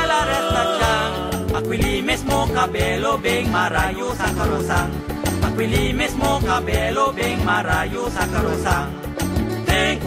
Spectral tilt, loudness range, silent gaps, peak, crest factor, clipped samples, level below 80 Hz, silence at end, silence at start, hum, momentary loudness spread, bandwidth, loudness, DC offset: -4.5 dB/octave; 1 LU; none; -4 dBFS; 16 dB; under 0.1%; -30 dBFS; 0 s; 0 s; none; 4 LU; 16 kHz; -20 LUFS; under 0.1%